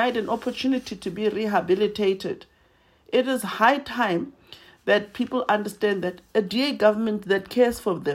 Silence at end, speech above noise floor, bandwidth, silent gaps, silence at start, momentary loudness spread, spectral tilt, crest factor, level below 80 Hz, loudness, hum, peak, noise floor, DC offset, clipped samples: 0 s; 37 dB; 16 kHz; none; 0 s; 8 LU; -5 dB/octave; 20 dB; -60 dBFS; -24 LUFS; none; -4 dBFS; -60 dBFS; under 0.1%; under 0.1%